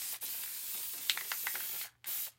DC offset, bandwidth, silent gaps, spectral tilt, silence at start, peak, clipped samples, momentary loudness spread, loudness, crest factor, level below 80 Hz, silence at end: under 0.1%; 17 kHz; none; 2.5 dB/octave; 0 s; -10 dBFS; under 0.1%; 4 LU; -36 LUFS; 30 dB; -86 dBFS; 0.05 s